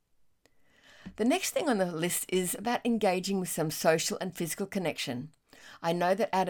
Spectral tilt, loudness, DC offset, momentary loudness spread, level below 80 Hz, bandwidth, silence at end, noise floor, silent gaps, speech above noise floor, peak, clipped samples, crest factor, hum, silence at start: -4 dB/octave; -30 LUFS; under 0.1%; 9 LU; -66 dBFS; 18 kHz; 0 s; -66 dBFS; none; 36 dB; -12 dBFS; under 0.1%; 20 dB; none; 1.05 s